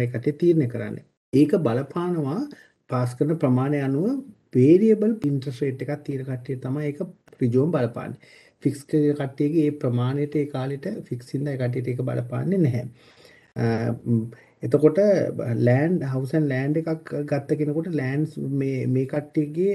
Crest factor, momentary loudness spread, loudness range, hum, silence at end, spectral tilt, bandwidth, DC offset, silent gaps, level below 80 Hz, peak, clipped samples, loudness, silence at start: 20 dB; 11 LU; 5 LU; none; 0 s; -9 dB/octave; 12.5 kHz; under 0.1%; 1.17-1.32 s; -66 dBFS; -4 dBFS; under 0.1%; -24 LUFS; 0 s